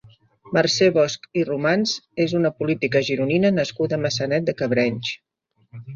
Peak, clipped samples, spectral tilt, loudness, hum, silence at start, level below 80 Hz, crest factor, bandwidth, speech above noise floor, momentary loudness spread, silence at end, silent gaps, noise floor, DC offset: -2 dBFS; under 0.1%; -5 dB/octave; -21 LUFS; none; 0.05 s; -60 dBFS; 18 dB; 7.6 kHz; 32 dB; 7 LU; 0 s; none; -52 dBFS; under 0.1%